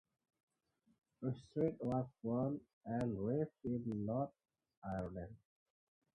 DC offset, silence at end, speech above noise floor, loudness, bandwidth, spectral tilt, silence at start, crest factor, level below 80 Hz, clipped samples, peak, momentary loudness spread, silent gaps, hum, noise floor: under 0.1%; 0.8 s; 39 dB; -42 LUFS; 10 kHz; -10 dB/octave; 1.2 s; 20 dB; -66 dBFS; under 0.1%; -24 dBFS; 8 LU; 2.73-2.81 s, 4.77-4.82 s; none; -80 dBFS